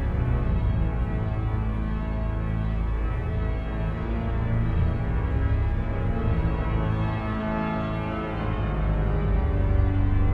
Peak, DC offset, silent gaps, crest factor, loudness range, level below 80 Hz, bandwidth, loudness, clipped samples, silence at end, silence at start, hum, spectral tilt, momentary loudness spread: -10 dBFS; under 0.1%; none; 14 dB; 2 LU; -28 dBFS; 4.6 kHz; -27 LUFS; under 0.1%; 0 s; 0 s; none; -10 dB/octave; 5 LU